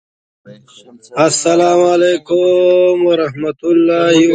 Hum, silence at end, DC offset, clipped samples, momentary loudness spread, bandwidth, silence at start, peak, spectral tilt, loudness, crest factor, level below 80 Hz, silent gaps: none; 0 s; under 0.1%; under 0.1%; 5 LU; 9.4 kHz; 0.45 s; 0 dBFS; -4.5 dB/octave; -12 LUFS; 12 dB; -58 dBFS; none